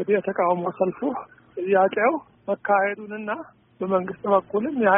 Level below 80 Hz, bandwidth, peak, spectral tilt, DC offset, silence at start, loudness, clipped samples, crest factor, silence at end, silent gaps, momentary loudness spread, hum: -68 dBFS; 3.7 kHz; -6 dBFS; -1 dB/octave; under 0.1%; 0 s; -24 LUFS; under 0.1%; 18 dB; 0 s; none; 12 LU; none